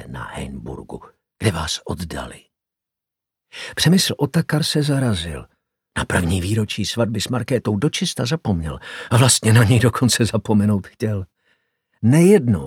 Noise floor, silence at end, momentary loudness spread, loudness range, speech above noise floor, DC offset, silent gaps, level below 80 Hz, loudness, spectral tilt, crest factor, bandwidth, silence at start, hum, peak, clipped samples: -85 dBFS; 0 s; 18 LU; 7 LU; 67 dB; under 0.1%; none; -42 dBFS; -19 LUFS; -5 dB/octave; 18 dB; 16.5 kHz; 0 s; none; 0 dBFS; under 0.1%